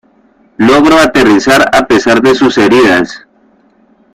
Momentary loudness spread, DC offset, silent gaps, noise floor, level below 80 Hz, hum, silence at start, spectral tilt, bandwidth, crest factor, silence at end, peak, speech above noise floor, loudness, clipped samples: 4 LU; under 0.1%; none; -48 dBFS; -38 dBFS; none; 0.6 s; -4.5 dB/octave; 16 kHz; 8 dB; 0.95 s; 0 dBFS; 41 dB; -7 LUFS; 0.1%